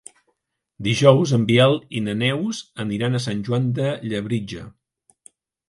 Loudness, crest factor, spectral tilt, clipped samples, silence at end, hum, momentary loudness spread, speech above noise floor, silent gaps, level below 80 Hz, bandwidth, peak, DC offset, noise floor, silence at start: -20 LUFS; 20 dB; -6 dB/octave; under 0.1%; 1 s; none; 13 LU; 54 dB; none; -54 dBFS; 11.5 kHz; 0 dBFS; under 0.1%; -73 dBFS; 0.8 s